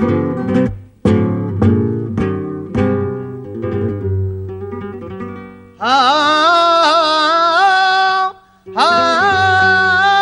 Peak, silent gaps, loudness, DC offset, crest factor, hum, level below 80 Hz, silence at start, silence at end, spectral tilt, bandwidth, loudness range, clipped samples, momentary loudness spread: 0 dBFS; none; -13 LUFS; under 0.1%; 14 dB; none; -42 dBFS; 0 s; 0 s; -5.5 dB/octave; 10.5 kHz; 9 LU; under 0.1%; 16 LU